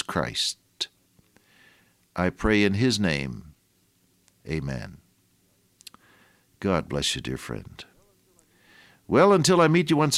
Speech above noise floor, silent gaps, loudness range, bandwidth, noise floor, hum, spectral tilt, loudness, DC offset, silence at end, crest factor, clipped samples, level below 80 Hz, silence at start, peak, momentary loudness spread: 43 dB; none; 10 LU; 16 kHz; -66 dBFS; none; -4.5 dB/octave; -24 LUFS; under 0.1%; 0 s; 20 dB; under 0.1%; -48 dBFS; 0.1 s; -6 dBFS; 19 LU